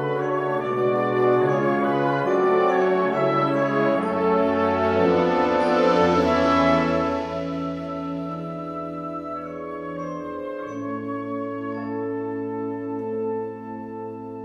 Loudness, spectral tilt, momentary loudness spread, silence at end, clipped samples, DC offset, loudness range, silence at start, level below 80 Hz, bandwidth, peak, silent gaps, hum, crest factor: -23 LUFS; -7 dB/octave; 12 LU; 0 s; under 0.1%; under 0.1%; 11 LU; 0 s; -52 dBFS; 9.8 kHz; -6 dBFS; none; none; 16 dB